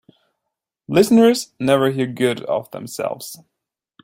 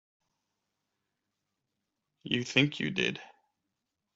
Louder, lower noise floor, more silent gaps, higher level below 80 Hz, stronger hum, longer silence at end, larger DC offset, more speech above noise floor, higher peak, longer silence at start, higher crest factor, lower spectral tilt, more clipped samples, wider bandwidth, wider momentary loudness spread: first, -18 LUFS vs -30 LUFS; about the same, -82 dBFS vs -85 dBFS; neither; first, -60 dBFS vs -74 dBFS; neither; second, 0.7 s vs 0.9 s; neither; first, 64 dB vs 55 dB; first, -2 dBFS vs -8 dBFS; second, 0.9 s vs 2.25 s; second, 18 dB vs 28 dB; about the same, -5.5 dB/octave vs -4.5 dB/octave; neither; first, 16.5 kHz vs 8 kHz; about the same, 15 LU vs 16 LU